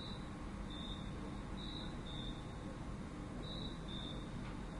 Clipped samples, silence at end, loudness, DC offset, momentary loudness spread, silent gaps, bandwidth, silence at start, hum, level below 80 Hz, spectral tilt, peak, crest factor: under 0.1%; 0 s; -47 LUFS; under 0.1%; 2 LU; none; 11.5 kHz; 0 s; none; -52 dBFS; -5.5 dB/octave; -32 dBFS; 14 dB